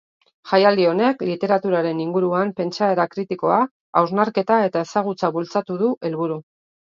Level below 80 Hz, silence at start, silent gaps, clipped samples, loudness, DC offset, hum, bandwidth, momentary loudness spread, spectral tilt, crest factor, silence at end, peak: -70 dBFS; 0.45 s; 3.71-3.93 s, 5.97-6.01 s; under 0.1%; -20 LUFS; under 0.1%; none; 7.4 kHz; 7 LU; -6.5 dB/octave; 20 dB; 0.45 s; 0 dBFS